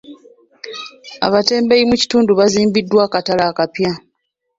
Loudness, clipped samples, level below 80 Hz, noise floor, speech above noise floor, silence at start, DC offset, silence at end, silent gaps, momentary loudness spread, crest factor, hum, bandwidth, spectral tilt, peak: -14 LUFS; under 0.1%; -50 dBFS; -71 dBFS; 57 dB; 0.1 s; under 0.1%; 0.6 s; none; 17 LU; 16 dB; none; 7.8 kHz; -4.5 dB/octave; 0 dBFS